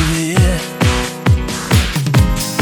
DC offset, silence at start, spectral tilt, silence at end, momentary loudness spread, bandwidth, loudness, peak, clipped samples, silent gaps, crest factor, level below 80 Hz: under 0.1%; 0 s; -5 dB/octave; 0 s; 2 LU; over 20 kHz; -15 LUFS; 0 dBFS; under 0.1%; none; 14 dB; -22 dBFS